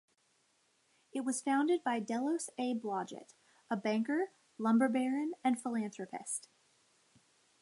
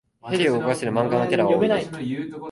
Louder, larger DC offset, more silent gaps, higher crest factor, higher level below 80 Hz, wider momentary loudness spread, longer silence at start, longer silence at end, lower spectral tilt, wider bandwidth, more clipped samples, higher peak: second, -35 LUFS vs -22 LUFS; neither; neither; about the same, 18 dB vs 16 dB; second, under -90 dBFS vs -60 dBFS; about the same, 11 LU vs 10 LU; first, 1.15 s vs 0.25 s; first, 1.2 s vs 0 s; second, -4.5 dB/octave vs -6 dB/octave; about the same, 11.5 kHz vs 11.5 kHz; neither; second, -18 dBFS vs -6 dBFS